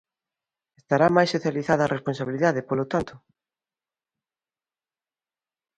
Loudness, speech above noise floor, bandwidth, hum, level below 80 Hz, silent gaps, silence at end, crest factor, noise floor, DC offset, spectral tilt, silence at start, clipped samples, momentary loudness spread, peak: -23 LUFS; over 67 dB; 10.5 kHz; none; -60 dBFS; none; 2.6 s; 22 dB; under -90 dBFS; under 0.1%; -6.5 dB/octave; 0.9 s; under 0.1%; 9 LU; -4 dBFS